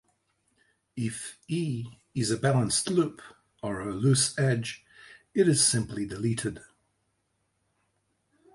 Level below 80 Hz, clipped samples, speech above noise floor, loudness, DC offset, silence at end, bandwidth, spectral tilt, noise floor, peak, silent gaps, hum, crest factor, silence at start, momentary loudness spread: -60 dBFS; under 0.1%; 48 dB; -27 LUFS; under 0.1%; 1.95 s; 11.5 kHz; -4.5 dB/octave; -76 dBFS; -10 dBFS; none; none; 20 dB; 0.95 s; 14 LU